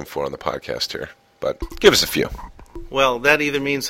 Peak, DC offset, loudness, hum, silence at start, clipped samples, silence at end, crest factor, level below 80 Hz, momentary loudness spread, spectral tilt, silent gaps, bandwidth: 0 dBFS; under 0.1%; -19 LUFS; none; 0 s; under 0.1%; 0 s; 20 dB; -40 dBFS; 16 LU; -3 dB/octave; none; 16.5 kHz